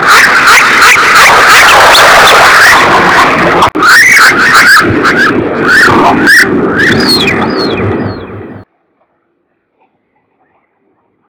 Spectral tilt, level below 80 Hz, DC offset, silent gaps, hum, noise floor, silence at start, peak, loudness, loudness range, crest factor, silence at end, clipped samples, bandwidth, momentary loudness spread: -2.5 dB/octave; -34 dBFS; under 0.1%; none; none; -58 dBFS; 0 s; 0 dBFS; -3 LUFS; 12 LU; 6 dB; 2.65 s; 10%; over 20 kHz; 10 LU